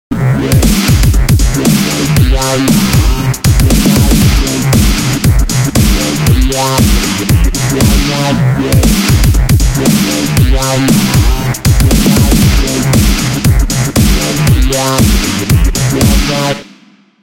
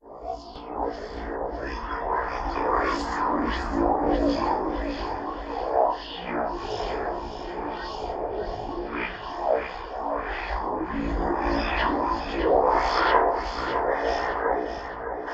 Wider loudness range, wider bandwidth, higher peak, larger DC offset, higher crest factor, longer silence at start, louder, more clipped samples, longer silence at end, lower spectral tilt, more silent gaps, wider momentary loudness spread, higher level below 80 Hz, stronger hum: second, 1 LU vs 7 LU; first, 17 kHz vs 8.2 kHz; first, 0 dBFS vs -6 dBFS; neither; second, 8 dB vs 22 dB; about the same, 0.1 s vs 0.05 s; first, -10 LUFS vs -27 LUFS; neither; first, 0.6 s vs 0 s; about the same, -5 dB/octave vs -6 dB/octave; neither; second, 3 LU vs 11 LU; first, -14 dBFS vs -38 dBFS; neither